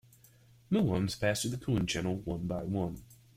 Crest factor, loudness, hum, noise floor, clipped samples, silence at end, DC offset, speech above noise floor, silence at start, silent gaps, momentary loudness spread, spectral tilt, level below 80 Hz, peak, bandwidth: 18 dB; -33 LUFS; none; -61 dBFS; under 0.1%; 0.25 s; under 0.1%; 29 dB; 0.7 s; none; 6 LU; -5.5 dB/octave; -54 dBFS; -16 dBFS; 16 kHz